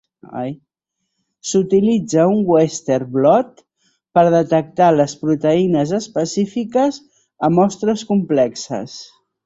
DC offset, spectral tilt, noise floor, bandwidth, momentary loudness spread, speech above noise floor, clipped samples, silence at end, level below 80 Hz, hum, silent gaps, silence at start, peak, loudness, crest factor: under 0.1%; -6 dB/octave; -76 dBFS; 8 kHz; 14 LU; 60 dB; under 0.1%; 0.4 s; -58 dBFS; none; none; 0.3 s; -2 dBFS; -17 LUFS; 16 dB